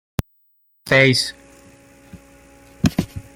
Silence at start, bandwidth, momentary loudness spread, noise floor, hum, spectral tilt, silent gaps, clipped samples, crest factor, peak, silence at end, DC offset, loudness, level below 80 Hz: 0.2 s; 16.5 kHz; 16 LU; -61 dBFS; none; -4.5 dB/octave; none; under 0.1%; 22 dB; -2 dBFS; 0.15 s; under 0.1%; -18 LUFS; -42 dBFS